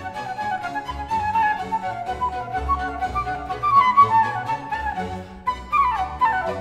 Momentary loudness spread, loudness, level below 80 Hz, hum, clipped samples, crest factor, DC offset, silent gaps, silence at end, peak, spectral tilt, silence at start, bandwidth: 13 LU; -22 LUFS; -40 dBFS; none; under 0.1%; 18 dB; under 0.1%; none; 0 s; -4 dBFS; -5 dB/octave; 0 s; 13 kHz